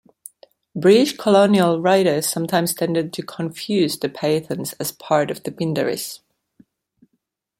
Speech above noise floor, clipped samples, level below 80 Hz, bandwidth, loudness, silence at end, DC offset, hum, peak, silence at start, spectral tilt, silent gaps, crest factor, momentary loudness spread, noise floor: 54 dB; under 0.1%; -64 dBFS; 16.5 kHz; -19 LUFS; 1.45 s; under 0.1%; none; -2 dBFS; 0.75 s; -5 dB/octave; none; 18 dB; 13 LU; -73 dBFS